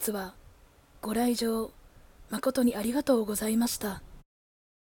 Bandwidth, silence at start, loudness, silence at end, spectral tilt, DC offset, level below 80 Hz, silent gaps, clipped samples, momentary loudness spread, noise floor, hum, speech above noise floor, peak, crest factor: 18 kHz; 0 s; -29 LUFS; 0.7 s; -4 dB/octave; under 0.1%; -54 dBFS; none; under 0.1%; 13 LU; -57 dBFS; none; 29 dB; -12 dBFS; 18 dB